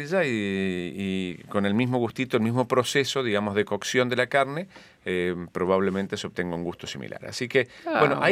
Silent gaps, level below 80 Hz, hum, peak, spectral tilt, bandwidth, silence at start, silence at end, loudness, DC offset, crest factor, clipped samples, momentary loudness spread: none; -64 dBFS; none; -4 dBFS; -5 dB/octave; 15.5 kHz; 0 s; 0 s; -26 LUFS; under 0.1%; 22 dB; under 0.1%; 10 LU